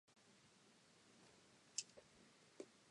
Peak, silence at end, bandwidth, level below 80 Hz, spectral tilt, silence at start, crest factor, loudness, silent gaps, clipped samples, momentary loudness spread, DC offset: -26 dBFS; 0 s; 11 kHz; under -90 dBFS; -1 dB/octave; 0.05 s; 36 dB; -53 LUFS; none; under 0.1%; 19 LU; under 0.1%